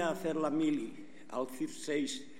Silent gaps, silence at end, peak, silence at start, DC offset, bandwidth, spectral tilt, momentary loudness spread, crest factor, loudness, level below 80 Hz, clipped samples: none; 0 s; -20 dBFS; 0 s; 0.4%; 16 kHz; -4.5 dB/octave; 11 LU; 16 dB; -36 LUFS; -82 dBFS; under 0.1%